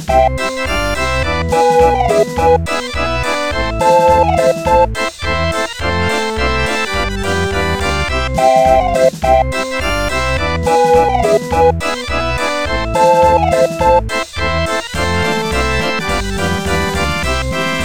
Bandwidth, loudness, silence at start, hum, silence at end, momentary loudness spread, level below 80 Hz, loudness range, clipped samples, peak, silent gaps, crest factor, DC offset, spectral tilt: 18 kHz; -14 LUFS; 0 s; none; 0 s; 7 LU; -26 dBFS; 3 LU; under 0.1%; 0 dBFS; none; 14 dB; 3%; -4.5 dB/octave